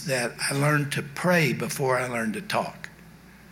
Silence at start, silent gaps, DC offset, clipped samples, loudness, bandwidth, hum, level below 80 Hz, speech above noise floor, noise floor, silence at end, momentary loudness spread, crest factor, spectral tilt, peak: 0 s; none; under 0.1%; under 0.1%; -25 LUFS; 17 kHz; none; -60 dBFS; 23 dB; -49 dBFS; 0 s; 9 LU; 16 dB; -4.5 dB/octave; -10 dBFS